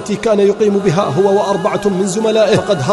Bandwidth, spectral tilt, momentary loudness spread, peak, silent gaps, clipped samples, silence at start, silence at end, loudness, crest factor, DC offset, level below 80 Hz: 11.5 kHz; -5.5 dB/octave; 4 LU; -2 dBFS; none; under 0.1%; 0 s; 0 s; -13 LUFS; 12 dB; under 0.1%; -48 dBFS